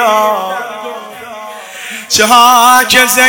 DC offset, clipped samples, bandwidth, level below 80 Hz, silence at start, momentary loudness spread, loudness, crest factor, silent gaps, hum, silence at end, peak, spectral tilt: under 0.1%; 3%; over 20 kHz; -50 dBFS; 0 s; 21 LU; -7 LUFS; 10 dB; none; none; 0 s; 0 dBFS; -0.5 dB/octave